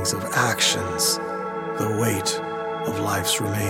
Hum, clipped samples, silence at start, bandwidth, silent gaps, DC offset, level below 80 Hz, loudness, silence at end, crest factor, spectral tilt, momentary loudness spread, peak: none; under 0.1%; 0 s; 17 kHz; none; under 0.1%; -56 dBFS; -23 LUFS; 0 s; 18 dB; -3 dB/octave; 9 LU; -6 dBFS